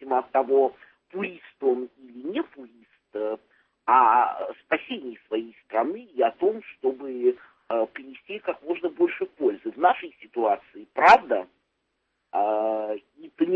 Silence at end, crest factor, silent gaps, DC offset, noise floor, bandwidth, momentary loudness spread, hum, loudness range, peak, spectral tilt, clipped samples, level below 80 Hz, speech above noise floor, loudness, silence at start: 0 s; 22 dB; none; under 0.1%; -76 dBFS; 7.8 kHz; 16 LU; none; 5 LU; -4 dBFS; -5.5 dB/octave; under 0.1%; -68 dBFS; 54 dB; -25 LUFS; 0 s